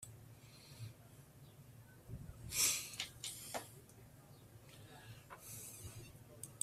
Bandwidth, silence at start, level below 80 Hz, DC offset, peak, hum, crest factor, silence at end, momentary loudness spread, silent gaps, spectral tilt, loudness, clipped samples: 16 kHz; 0 s; -68 dBFS; under 0.1%; -22 dBFS; none; 26 dB; 0 s; 25 LU; none; -1 dB/octave; -42 LUFS; under 0.1%